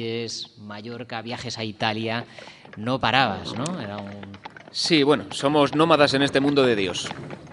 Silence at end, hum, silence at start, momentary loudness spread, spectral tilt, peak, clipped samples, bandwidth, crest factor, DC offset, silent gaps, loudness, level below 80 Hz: 0 s; none; 0 s; 19 LU; -4.5 dB/octave; 0 dBFS; under 0.1%; 11 kHz; 22 dB; under 0.1%; none; -23 LUFS; -60 dBFS